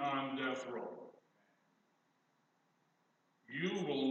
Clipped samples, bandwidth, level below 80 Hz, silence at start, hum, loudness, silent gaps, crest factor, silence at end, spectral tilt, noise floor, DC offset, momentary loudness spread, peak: under 0.1%; 8.2 kHz; under -90 dBFS; 0 s; none; -40 LUFS; none; 18 dB; 0 s; -5.5 dB/octave; -78 dBFS; under 0.1%; 14 LU; -26 dBFS